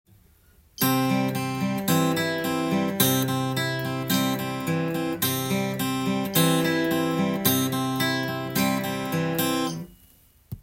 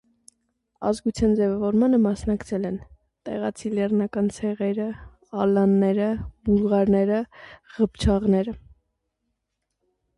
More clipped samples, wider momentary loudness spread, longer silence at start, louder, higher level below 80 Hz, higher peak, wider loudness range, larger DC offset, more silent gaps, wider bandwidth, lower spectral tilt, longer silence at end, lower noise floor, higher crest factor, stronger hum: neither; second, 6 LU vs 13 LU; about the same, 0.8 s vs 0.8 s; about the same, -24 LUFS vs -23 LUFS; second, -58 dBFS vs -42 dBFS; first, -4 dBFS vs -10 dBFS; about the same, 2 LU vs 4 LU; neither; neither; first, 17 kHz vs 11 kHz; second, -4.5 dB/octave vs -7.5 dB/octave; second, 0 s vs 1.6 s; second, -57 dBFS vs -79 dBFS; first, 20 dB vs 14 dB; neither